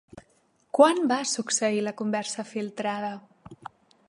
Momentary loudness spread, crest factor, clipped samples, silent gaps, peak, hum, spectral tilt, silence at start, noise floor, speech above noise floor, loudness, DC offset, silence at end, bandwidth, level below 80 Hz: 25 LU; 24 dB; under 0.1%; none; -4 dBFS; none; -3 dB/octave; 0.15 s; -66 dBFS; 41 dB; -26 LUFS; under 0.1%; 0.4 s; 11.5 kHz; -70 dBFS